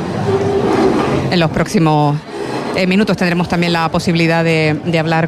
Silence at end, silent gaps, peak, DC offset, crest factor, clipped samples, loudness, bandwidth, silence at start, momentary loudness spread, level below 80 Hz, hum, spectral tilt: 0 s; none; -2 dBFS; under 0.1%; 12 dB; under 0.1%; -14 LUFS; 13 kHz; 0 s; 4 LU; -40 dBFS; none; -6.5 dB/octave